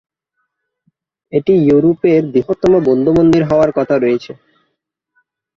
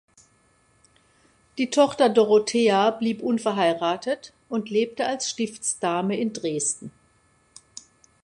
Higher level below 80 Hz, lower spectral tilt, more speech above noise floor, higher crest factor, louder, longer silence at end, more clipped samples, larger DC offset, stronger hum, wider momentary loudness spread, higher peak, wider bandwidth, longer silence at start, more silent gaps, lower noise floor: first, -44 dBFS vs -70 dBFS; first, -8.5 dB/octave vs -3.5 dB/octave; first, 60 dB vs 40 dB; second, 14 dB vs 20 dB; first, -13 LUFS vs -23 LUFS; about the same, 1.25 s vs 1.35 s; neither; neither; neither; second, 7 LU vs 15 LU; about the same, -2 dBFS vs -4 dBFS; second, 7.4 kHz vs 11.5 kHz; second, 1.3 s vs 1.55 s; neither; first, -72 dBFS vs -62 dBFS